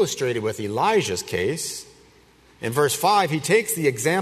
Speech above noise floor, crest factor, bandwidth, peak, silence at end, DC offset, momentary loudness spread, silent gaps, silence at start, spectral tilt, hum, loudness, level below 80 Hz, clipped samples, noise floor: 32 dB; 18 dB; 13.5 kHz; -4 dBFS; 0 s; under 0.1%; 9 LU; none; 0 s; -3.5 dB/octave; none; -22 LUFS; -60 dBFS; under 0.1%; -54 dBFS